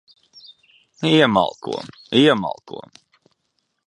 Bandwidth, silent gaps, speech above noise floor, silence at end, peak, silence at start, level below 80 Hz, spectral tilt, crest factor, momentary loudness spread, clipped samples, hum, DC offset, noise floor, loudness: 11 kHz; none; 53 dB; 1.05 s; -2 dBFS; 1 s; -60 dBFS; -5.5 dB/octave; 20 dB; 19 LU; under 0.1%; none; under 0.1%; -72 dBFS; -18 LUFS